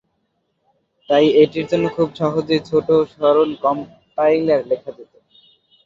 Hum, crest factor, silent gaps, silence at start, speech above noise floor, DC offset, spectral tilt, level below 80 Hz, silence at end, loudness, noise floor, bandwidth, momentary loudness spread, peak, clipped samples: none; 16 dB; none; 1.1 s; 53 dB; under 0.1%; -7 dB/octave; -58 dBFS; 0.8 s; -17 LUFS; -69 dBFS; 7.4 kHz; 10 LU; -2 dBFS; under 0.1%